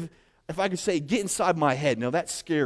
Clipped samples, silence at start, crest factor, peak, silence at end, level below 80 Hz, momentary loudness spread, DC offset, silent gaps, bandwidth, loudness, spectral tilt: under 0.1%; 0 s; 18 dB; -10 dBFS; 0 s; -60 dBFS; 6 LU; under 0.1%; none; 11 kHz; -26 LUFS; -4.5 dB/octave